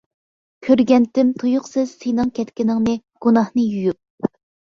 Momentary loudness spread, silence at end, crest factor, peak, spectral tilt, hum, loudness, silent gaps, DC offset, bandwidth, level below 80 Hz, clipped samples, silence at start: 11 LU; 0.4 s; 16 dB; -2 dBFS; -7 dB/octave; none; -19 LUFS; 4.10-4.18 s; under 0.1%; 7.2 kHz; -54 dBFS; under 0.1%; 0.6 s